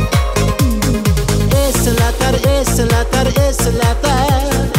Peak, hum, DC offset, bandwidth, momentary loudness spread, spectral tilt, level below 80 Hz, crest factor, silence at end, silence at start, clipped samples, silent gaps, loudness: -2 dBFS; none; under 0.1%; 16.5 kHz; 2 LU; -5 dB/octave; -18 dBFS; 10 dB; 0 s; 0 s; under 0.1%; none; -14 LUFS